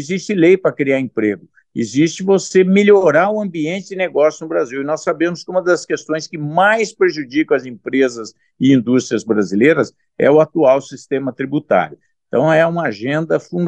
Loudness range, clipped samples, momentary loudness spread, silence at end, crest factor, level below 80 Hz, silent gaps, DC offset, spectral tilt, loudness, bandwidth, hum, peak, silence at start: 3 LU; under 0.1%; 10 LU; 0 s; 14 dB; -66 dBFS; none; under 0.1%; -6 dB/octave; -16 LUFS; 9 kHz; none; 0 dBFS; 0 s